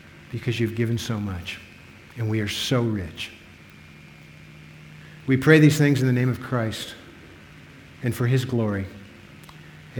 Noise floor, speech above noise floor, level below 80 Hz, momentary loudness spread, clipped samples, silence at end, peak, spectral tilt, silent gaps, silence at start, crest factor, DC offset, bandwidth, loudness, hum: -47 dBFS; 25 dB; -54 dBFS; 27 LU; under 0.1%; 0 s; -2 dBFS; -6 dB/octave; none; 0.05 s; 24 dB; under 0.1%; 18.5 kHz; -23 LUFS; none